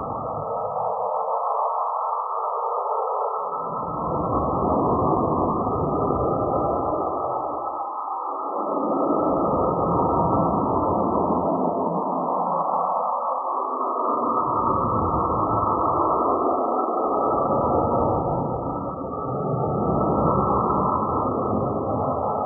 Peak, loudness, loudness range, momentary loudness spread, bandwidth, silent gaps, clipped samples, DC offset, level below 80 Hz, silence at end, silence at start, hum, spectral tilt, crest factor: -6 dBFS; -23 LUFS; 3 LU; 6 LU; 1.5 kHz; none; under 0.1%; under 0.1%; -44 dBFS; 0 s; 0 s; none; 0.5 dB/octave; 16 dB